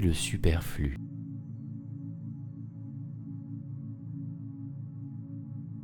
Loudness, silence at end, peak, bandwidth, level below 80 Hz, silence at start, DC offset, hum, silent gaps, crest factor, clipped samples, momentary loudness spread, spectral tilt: -37 LUFS; 0 s; -10 dBFS; 19 kHz; -42 dBFS; 0 s; under 0.1%; none; none; 24 dB; under 0.1%; 13 LU; -5.5 dB/octave